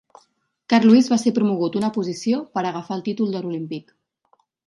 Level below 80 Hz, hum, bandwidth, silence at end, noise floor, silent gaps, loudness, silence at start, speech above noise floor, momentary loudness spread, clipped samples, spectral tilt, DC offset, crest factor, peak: -70 dBFS; none; 11.5 kHz; 0.85 s; -65 dBFS; none; -20 LUFS; 0.7 s; 46 dB; 14 LU; under 0.1%; -6 dB/octave; under 0.1%; 18 dB; -2 dBFS